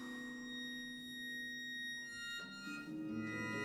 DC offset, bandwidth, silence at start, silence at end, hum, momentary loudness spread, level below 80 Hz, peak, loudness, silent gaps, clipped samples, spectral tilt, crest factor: under 0.1%; 19.5 kHz; 0 s; 0 s; none; 4 LU; -76 dBFS; -32 dBFS; -45 LUFS; none; under 0.1%; -3.5 dB/octave; 14 dB